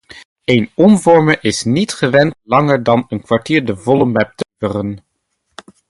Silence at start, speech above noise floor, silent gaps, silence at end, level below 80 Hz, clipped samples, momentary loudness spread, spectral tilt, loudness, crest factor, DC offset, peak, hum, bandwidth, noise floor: 0.15 s; 55 dB; 0.25-0.36 s; 0.9 s; -48 dBFS; under 0.1%; 11 LU; -6 dB/octave; -14 LUFS; 14 dB; under 0.1%; 0 dBFS; none; 11.5 kHz; -68 dBFS